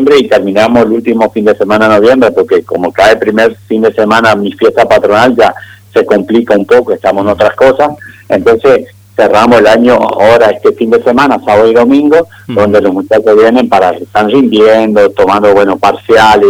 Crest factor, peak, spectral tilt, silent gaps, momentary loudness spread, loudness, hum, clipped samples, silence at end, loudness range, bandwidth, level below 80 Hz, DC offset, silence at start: 6 dB; 0 dBFS; -5.5 dB/octave; none; 5 LU; -7 LUFS; none; 3%; 0 s; 2 LU; 16 kHz; -40 dBFS; 0.3%; 0 s